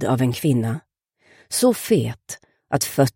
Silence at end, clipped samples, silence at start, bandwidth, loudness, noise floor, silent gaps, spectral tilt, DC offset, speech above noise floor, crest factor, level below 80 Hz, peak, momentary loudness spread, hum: 0.05 s; under 0.1%; 0 s; 17 kHz; -21 LUFS; -58 dBFS; none; -5.5 dB/octave; under 0.1%; 38 dB; 16 dB; -58 dBFS; -6 dBFS; 15 LU; none